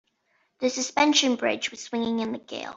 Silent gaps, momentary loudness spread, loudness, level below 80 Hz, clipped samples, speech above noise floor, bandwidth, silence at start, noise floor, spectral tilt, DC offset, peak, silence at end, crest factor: none; 10 LU; -25 LUFS; -70 dBFS; under 0.1%; 45 dB; 8 kHz; 0.6 s; -70 dBFS; -2 dB/octave; under 0.1%; -8 dBFS; 0 s; 18 dB